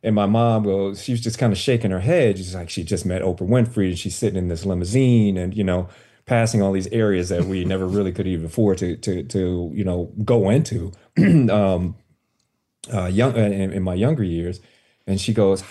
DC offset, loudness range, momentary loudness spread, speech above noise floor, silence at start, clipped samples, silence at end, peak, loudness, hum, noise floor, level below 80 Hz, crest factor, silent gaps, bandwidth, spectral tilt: under 0.1%; 2 LU; 9 LU; 52 dB; 0.05 s; under 0.1%; 0 s; -6 dBFS; -21 LUFS; none; -71 dBFS; -46 dBFS; 14 dB; none; 12.5 kHz; -7 dB/octave